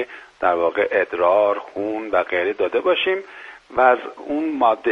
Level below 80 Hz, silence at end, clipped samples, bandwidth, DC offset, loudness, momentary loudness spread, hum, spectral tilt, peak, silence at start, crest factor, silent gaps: -60 dBFS; 0 s; under 0.1%; 6.8 kHz; under 0.1%; -20 LUFS; 10 LU; none; -5.5 dB/octave; -2 dBFS; 0 s; 18 dB; none